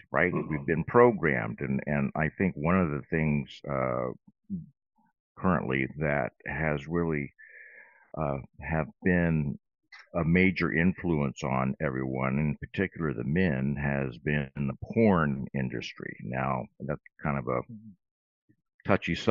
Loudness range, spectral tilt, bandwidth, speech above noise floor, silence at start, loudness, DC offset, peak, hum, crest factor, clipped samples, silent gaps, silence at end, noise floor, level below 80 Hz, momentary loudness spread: 5 LU; -6.5 dB/octave; 7.4 kHz; 26 dB; 0.1 s; -29 LUFS; under 0.1%; -6 dBFS; none; 24 dB; under 0.1%; 5.20-5.35 s, 18.11-18.48 s, 18.74-18.79 s; 0 s; -54 dBFS; -52 dBFS; 13 LU